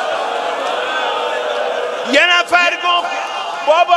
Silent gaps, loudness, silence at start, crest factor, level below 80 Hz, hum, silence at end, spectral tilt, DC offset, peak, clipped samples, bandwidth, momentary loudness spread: none; -15 LUFS; 0 s; 16 dB; -68 dBFS; none; 0 s; -0.5 dB/octave; under 0.1%; 0 dBFS; under 0.1%; 13 kHz; 9 LU